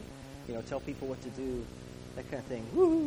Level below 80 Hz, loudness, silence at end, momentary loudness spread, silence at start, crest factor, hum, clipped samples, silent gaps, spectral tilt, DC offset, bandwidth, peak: -54 dBFS; -36 LUFS; 0 s; 16 LU; 0 s; 18 dB; none; under 0.1%; none; -7 dB/octave; under 0.1%; over 20 kHz; -16 dBFS